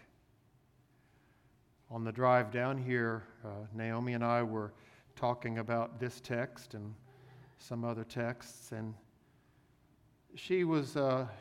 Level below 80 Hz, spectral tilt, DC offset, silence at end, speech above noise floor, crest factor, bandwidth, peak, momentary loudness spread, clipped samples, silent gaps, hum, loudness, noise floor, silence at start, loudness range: -74 dBFS; -7 dB/octave; under 0.1%; 0 s; 33 dB; 22 dB; 15.5 kHz; -16 dBFS; 16 LU; under 0.1%; none; none; -36 LUFS; -68 dBFS; 1.9 s; 9 LU